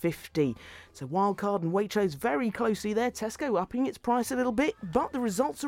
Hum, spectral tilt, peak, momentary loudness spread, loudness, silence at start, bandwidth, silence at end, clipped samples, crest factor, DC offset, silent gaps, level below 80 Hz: none; -5.5 dB/octave; -12 dBFS; 4 LU; -29 LUFS; 0 s; 17 kHz; 0 s; under 0.1%; 16 dB; under 0.1%; none; -58 dBFS